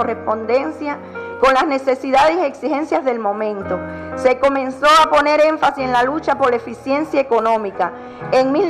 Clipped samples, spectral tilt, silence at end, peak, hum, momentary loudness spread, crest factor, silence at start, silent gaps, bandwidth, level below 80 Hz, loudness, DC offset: under 0.1%; -4.5 dB/octave; 0 s; 0 dBFS; none; 11 LU; 16 dB; 0 s; none; 13 kHz; -48 dBFS; -17 LUFS; under 0.1%